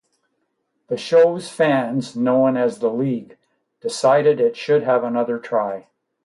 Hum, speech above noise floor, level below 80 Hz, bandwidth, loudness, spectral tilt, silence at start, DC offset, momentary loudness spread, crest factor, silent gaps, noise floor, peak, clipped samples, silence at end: none; 53 dB; -70 dBFS; 11.5 kHz; -19 LUFS; -6 dB/octave; 0.9 s; under 0.1%; 13 LU; 16 dB; none; -72 dBFS; -4 dBFS; under 0.1%; 0.45 s